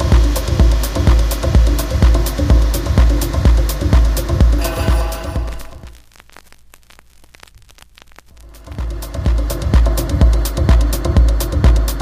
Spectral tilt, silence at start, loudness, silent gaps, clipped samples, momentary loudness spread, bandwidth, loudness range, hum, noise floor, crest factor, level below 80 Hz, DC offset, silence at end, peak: -6 dB/octave; 0 s; -16 LUFS; none; under 0.1%; 9 LU; 15.5 kHz; 15 LU; none; -45 dBFS; 14 dB; -14 dBFS; under 0.1%; 0 s; 0 dBFS